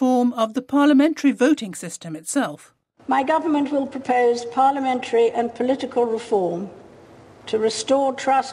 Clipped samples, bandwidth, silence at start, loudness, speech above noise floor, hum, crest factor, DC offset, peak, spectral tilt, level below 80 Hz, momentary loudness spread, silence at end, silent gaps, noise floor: under 0.1%; 13 kHz; 0 s; -21 LUFS; 26 dB; none; 14 dB; under 0.1%; -6 dBFS; -4.5 dB/octave; -66 dBFS; 12 LU; 0 s; none; -46 dBFS